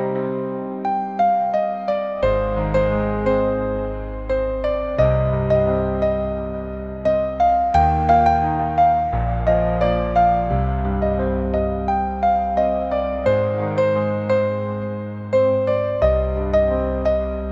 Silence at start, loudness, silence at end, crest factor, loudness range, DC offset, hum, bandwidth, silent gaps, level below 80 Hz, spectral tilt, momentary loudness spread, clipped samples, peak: 0 s; -20 LUFS; 0 s; 16 dB; 3 LU; 0.1%; none; 7.4 kHz; none; -30 dBFS; -9 dB/octave; 7 LU; under 0.1%; -4 dBFS